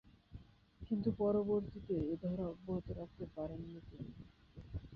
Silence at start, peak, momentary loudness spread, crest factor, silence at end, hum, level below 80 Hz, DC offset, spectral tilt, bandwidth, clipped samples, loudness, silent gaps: 0.05 s; -24 dBFS; 23 LU; 18 dB; 0 s; none; -58 dBFS; under 0.1%; -9.5 dB/octave; 5.6 kHz; under 0.1%; -40 LUFS; none